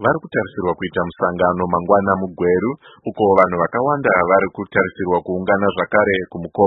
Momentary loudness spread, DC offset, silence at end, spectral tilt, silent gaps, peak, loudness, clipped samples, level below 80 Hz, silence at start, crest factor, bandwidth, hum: 8 LU; under 0.1%; 0 s; -9.5 dB/octave; none; 0 dBFS; -18 LUFS; under 0.1%; -50 dBFS; 0 s; 18 dB; 4.1 kHz; none